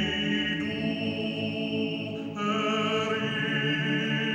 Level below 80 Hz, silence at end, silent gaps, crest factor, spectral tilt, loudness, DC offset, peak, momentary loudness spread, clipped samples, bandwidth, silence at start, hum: -58 dBFS; 0 s; none; 12 dB; -5.5 dB/octave; -28 LUFS; under 0.1%; -16 dBFS; 4 LU; under 0.1%; 9.2 kHz; 0 s; none